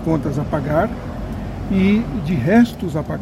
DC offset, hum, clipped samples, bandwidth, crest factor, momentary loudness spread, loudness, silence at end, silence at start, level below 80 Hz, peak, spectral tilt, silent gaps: under 0.1%; none; under 0.1%; 14.5 kHz; 14 dB; 13 LU; -19 LUFS; 0 s; 0 s; -34 dBFS; -4 dBFS; -8 dB/octave; none